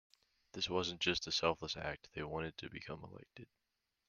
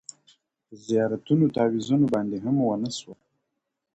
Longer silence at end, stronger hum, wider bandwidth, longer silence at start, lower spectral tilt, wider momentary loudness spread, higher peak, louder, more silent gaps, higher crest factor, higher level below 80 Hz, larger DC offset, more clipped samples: second, 0.65 s vs 0.8 s; neither; first, 10.5 kHz vs 8.8 kHz; second, 0.55 s vs 0.7 s; second, -3.5 dB/octave vs -7 dB/octave; first, 20 LU vs 12 LU; second, -18 dBFS vs -10 dBFS; second, -39 LUFS vs -24 LUFS; neither; first, 24 dB vs 16 dB; about the same, -66 dBFS vs -64 dBFS; neither; neither